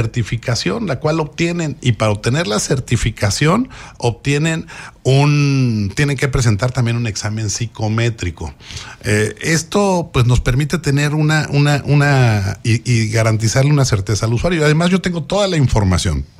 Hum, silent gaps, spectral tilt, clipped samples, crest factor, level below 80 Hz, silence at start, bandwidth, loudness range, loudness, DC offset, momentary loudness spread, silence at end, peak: none; none; -5.5 dB/octave; under 0.1%; 14 dB; -32 dBFS; 0 s; 14 kHz; 4 LU; -16 LUFS; under 0.1%; 7 LU; 0.15 s; -2 dBFS